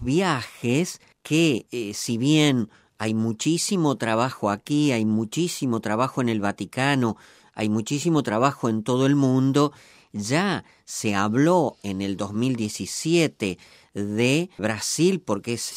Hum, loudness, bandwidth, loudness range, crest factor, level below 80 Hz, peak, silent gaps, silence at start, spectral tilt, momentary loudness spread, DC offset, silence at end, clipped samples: none; -23 LUFS; 16 kHz; 2 LU; 18 dB; -60 dBFS; -4 dBFS; none; 0 s; -5 dB/octave; 10 LU; under 0.1%; 0 s; under 0.1%